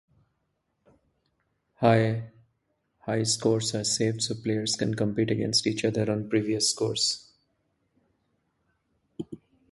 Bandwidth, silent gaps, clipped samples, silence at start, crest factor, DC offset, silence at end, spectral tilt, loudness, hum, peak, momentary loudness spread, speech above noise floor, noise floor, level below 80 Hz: 11.5 kHz; none; under 0.1%; 1.8 s; 22 dB; under 0.1%; 0.35 s; -4 dB/octave; -26 LUFS; none; -8 dBFS; 17 LU; 51 dB; -77 dBFS; -62 dBFS